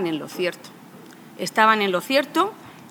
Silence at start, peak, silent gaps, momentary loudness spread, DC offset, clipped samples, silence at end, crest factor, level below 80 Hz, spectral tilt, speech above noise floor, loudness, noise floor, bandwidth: 0 s; -2 dBFS; none; 14 LU; under 0.1%; under 0.1%; 0 s; 22 dB; -78 dBFS; -4 dB/octave; 22 dB; -21 LUFS; -44 dBFS; over 20 kHz